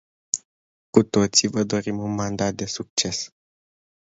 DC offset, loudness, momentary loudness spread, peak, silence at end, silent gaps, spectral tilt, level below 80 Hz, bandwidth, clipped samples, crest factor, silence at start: under 0.1%; -23 LUFS; 10 LU; 0 dBFS; 0.9 s; 0.45-0.93 s, 2.90-2.97 s; -3.5 dB/octave; -54 dBFS; 8 kHz; under 0.1%; 24 dB; 0.35 s